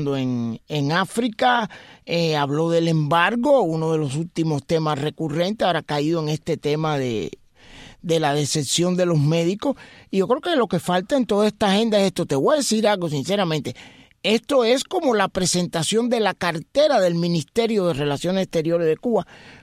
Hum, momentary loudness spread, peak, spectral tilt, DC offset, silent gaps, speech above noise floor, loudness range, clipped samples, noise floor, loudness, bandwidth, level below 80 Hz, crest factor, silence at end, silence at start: none; 7 LU; -4 dBFS; -5 dB/octave; under 0.1%; none; 24 dB; 3 LU; under 0.1%; -45 dBFS; -21 LUFS; 15.5 kHz; -54 dBFS; 18 dB; 0.05 s; 0 s